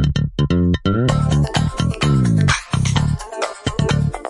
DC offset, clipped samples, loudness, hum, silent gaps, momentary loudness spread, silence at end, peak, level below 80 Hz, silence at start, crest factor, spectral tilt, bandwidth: under 0.1%; under 0.1%; -18 LUFS; none; none; 7 LU; 0 s; -2 dBFS; -30 dBFS; 0 s; 16 dB; -6 dB/octave; 11.5 kHz